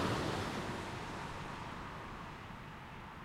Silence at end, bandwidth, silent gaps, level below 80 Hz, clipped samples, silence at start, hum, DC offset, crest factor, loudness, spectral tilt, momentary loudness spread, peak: 0 s; 16.5 kHz; none; -56 dBFS; under 0.1%; 0 s; none; under 0.1%; 18 dB; -43 LUFS; -5 dB/octave; 11 LU; -24 dBFS